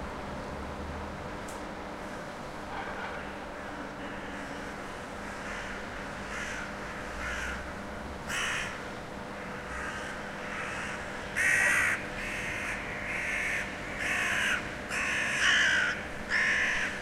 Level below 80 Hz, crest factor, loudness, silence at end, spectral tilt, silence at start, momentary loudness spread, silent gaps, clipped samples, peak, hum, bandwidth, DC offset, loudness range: -50 dBFS; 20 dB; -32 LUFS; 0 s; -2.5 dB/octave; 0 s; 14 LU; none; under 0.1%; -14 dBFS; none; 16.5 kHz; under 0.1%; 11 LU